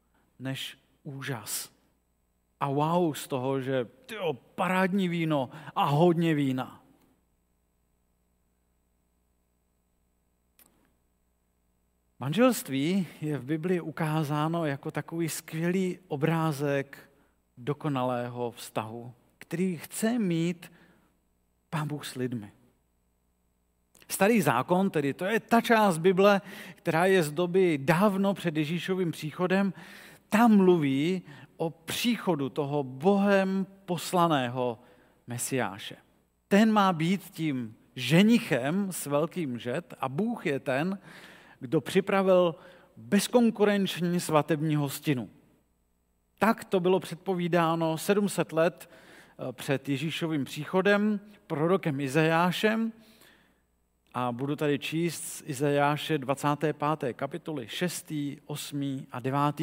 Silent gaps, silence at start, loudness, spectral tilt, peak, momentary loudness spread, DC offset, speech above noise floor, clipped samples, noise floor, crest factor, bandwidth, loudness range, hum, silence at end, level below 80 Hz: none; 0.4 s; -28 LUFS; -5.5 dB/octave; -8 dBFS; 12 LU; under 0.1%; 45 dB; under 0.1%; -73 dBFS; 20 dB; 16 kHz; 7 LU; 60 Hz at -55 dBFS; 0 s; -72 dBFS